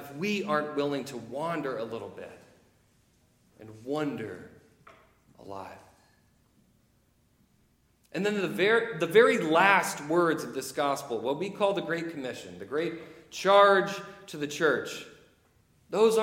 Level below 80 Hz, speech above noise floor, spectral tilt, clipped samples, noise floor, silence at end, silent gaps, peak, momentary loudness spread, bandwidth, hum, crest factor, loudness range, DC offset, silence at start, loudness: -72 dBFS; 40 dB; -4.5 dB/octave; under 0.1%; -67 dBFS; 0 s; none; -6 dBFS; 21 LU; 16.5 kHz; none; 24 dB; 15 LU; under 0.1%; 0 s; -27 LUFS